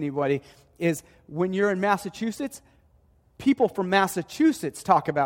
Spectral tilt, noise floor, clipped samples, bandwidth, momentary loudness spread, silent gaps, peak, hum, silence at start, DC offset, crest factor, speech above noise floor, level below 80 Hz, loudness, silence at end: -5.5 dB/octave; -61 dBFS; under 0.1%; 16.5 kHz; 11 LU; none; -6 dBFS; none; 0 s; under 0.1%; 20 dB; 36 dB; -62 dBFS; -25 LUFS; 0 s